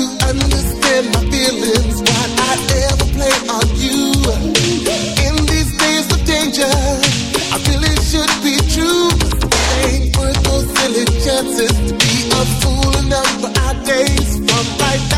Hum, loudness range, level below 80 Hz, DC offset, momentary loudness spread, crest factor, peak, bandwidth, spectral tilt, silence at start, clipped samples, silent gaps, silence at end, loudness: none; 1 LU; -20 dBFS; under 0.1%; 2 LU; 14 dB; 0 dBFS; 16.5 kHz; -3.5 dB/octave; 0 s; under 0.1%; none; 0 s; -14 LUFS